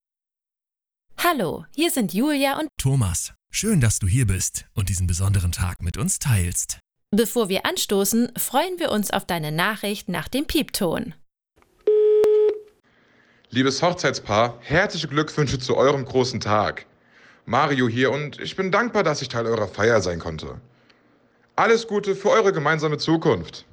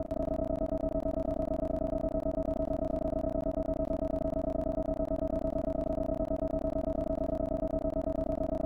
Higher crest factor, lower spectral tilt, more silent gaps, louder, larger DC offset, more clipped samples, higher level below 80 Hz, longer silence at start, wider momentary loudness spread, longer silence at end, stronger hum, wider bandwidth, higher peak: first, 18 dB vs 12 dB; second, -4.5 dB/octave vs -10 dB/octave; neither; first, -22 LUFS vs -33 LUFS; second, under 0.1% vs 0.2%; neither; about the same, -44 dBFS vs -40 dBFS; first, 1.1 s vs 0 s; first, 8 LU vs 1 LU; about the same, 0.1 s vs 0 s; neither; first, over 20 kHz vs 7 kHz; first, -4 dBFS vs -22 dBFS